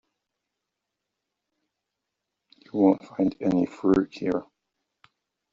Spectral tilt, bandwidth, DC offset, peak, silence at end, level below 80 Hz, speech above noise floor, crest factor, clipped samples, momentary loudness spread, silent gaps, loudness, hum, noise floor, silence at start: -7.5 dB/octave; 7.4 kHz; under 0.1%; -6 dBFS; 1.1 s; -60 dBFS; 60 dB; 22 dB; under 0.1%; 8 LU; none; -25 LUFS; none; -84 dBFS; 2.75 s